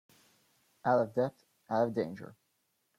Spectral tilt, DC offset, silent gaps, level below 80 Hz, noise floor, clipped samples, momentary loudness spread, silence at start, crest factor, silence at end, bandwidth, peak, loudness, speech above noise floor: -8 dB/octave; under 0.1%; none; -76 dBFS; -78 dBFS; under 0.1%; 14 LU; 0.85 s; 18 dB; 0.65 s; 14.5 kHz; -16 dBFS; -33 LUFS; 47 dB